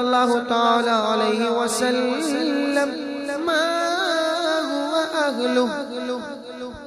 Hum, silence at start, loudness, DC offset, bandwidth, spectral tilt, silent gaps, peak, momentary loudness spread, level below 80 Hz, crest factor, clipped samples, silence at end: none; 0 s; -21 LUFS; under 0.1%; 14 kHz; -3 dB/octave; none; -6 dBFS; 9 LU; -62 dBFS; 16 dB; under 0.1%; 0 s